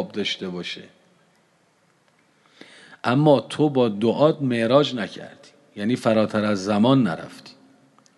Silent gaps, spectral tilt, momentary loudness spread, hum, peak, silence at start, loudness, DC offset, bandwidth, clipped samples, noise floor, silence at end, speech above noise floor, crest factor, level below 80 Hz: none; -6.5 dB/octave; 15 LU; none; -4 dBFS; 0 s; -21 LUFS; under 0.1%; 11.5 kHz; under 0.1%; -62 dBFS; 0.65 s; 41 dB; 20 dB; -64 dBFS